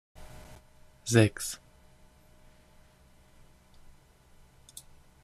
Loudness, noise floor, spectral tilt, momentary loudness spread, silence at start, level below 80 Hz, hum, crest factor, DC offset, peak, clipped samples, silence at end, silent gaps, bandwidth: -28 LUFS; -59 dBFS; -5 dB/octave; 28 LU; 0.2 s; -58 dBFS; none; 26 dB; under 0.1%; -8 dBFS; under 0.1%; 3.7 s; none; 14.5 kHz